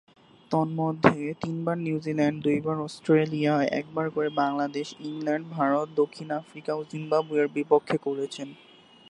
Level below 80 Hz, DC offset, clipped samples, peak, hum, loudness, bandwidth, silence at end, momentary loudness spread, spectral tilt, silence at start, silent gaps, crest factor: -66 dBFS; under 0.1%; under 0.1%; -2 dBFS; none; -27 LUFS; 10.5 kHz; 0.55 s; 10 LU; -7 dB/octave; 0.5 s; none; 24 dB